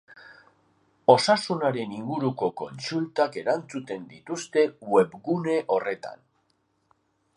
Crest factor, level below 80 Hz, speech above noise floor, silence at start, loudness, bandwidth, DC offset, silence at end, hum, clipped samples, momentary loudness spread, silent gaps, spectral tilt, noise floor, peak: 24 dB; -74 dBFS; 46 dB; 0.1 s; -26 LUFS; 11.5 kHz; under 0.1%; 1.2 s; none; under 0.1%; 15 LU; none; -5 dB/octave; -71 dBFS; -2 dBFS